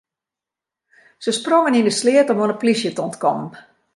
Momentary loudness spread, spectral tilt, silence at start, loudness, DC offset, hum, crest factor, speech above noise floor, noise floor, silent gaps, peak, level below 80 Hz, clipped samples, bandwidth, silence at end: 10 LU; -4 dB/octave; 1.2 s; -18 LUFS; under 0.1%; none; 16 dB; 70 dB; -87 dBFS; none; -2 dBFS; -70 dBFS; under 0.1%; 11.5 kHz; 0.35 s